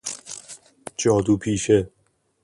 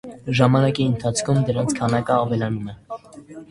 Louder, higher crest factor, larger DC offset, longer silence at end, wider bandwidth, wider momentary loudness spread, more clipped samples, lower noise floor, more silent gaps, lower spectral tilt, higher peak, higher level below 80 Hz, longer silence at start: about the same, -21 LUFS vs -20 LUFS; about the same, 18 dB vs 20 dB; neither; first, 0.55 s vs 0.05 s; about the same, 11.5 kHz vs 11.5 kHz; about the same, 18 LU vs 19 LU; neither; first, -45 dBFS vs -41 dBFS; neither; about the same, -5 dB/octave vs -6 dB/octave; second, -6 dBFS vs 0 dBFS; about the same, -48 dBFS vs -50 dBFS; about the same, 0.05 s vs 0.05 s